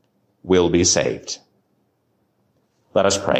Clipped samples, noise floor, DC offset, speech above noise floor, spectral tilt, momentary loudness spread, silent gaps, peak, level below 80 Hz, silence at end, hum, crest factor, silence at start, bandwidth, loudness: under 0.1%; -67 dBFS; under 0.1%; 49 dB; -3.5 dB/octave; 17 LU; none; -4 dBFS; -44 dBFS; 0 s; none; 18 dB; 0.45 s; 16 kHz; -18 LUFS